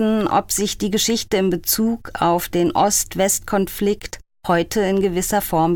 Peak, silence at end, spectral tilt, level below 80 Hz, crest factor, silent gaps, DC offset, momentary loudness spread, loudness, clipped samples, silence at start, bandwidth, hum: -6 dBFS; 0 s; -4 dB/octave; -42 dBFS; 14 dB; none; under 0.1%; 5 LU; -19 LUFS; under 0.1%; 0 s; 19 kHz; none